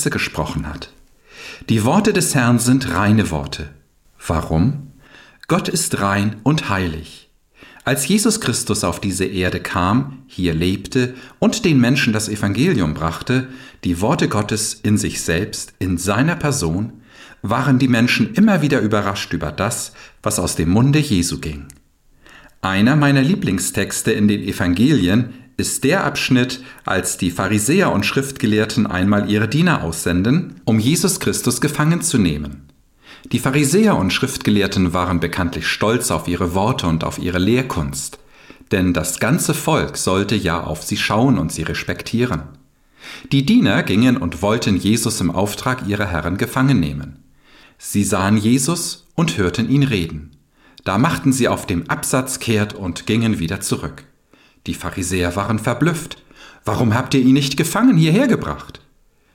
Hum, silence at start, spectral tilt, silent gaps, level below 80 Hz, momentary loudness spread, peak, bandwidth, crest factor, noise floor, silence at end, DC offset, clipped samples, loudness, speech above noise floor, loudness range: none; 0 s; -5 dB/octave; none; -40 dBFS; 11 LU; -4 dBFS; 17 kHz; 14 dB; -55 dBFS; 0.55 s; under 0.1%; under 0.1%; -18 LUFS; 38 dB; 3 LU